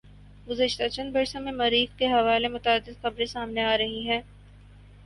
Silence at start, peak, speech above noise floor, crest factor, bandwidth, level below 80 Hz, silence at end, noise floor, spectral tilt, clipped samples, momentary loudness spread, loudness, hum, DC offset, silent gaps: 0.05 s; -10 dBFS; 24 dB; 18 dB; 11.5 kHz; -50 dBFS; 0 s; -50 dBFS; -4 dB/octave; under 0.1%; 7 LU; -26 LUFS; 50 Hz at -45 dBFS; under 0.1%; none